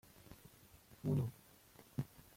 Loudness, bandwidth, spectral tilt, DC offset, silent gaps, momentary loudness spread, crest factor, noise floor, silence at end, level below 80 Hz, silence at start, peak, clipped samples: -43 LUFS; 16.5 kHz; -8 dB/octave; under 0.1%; none; 24 LU; 20 dB; -64 dBFS; 0.3 s; -68 dBFS; 0.3 s; -26 dBFS; under 0.1%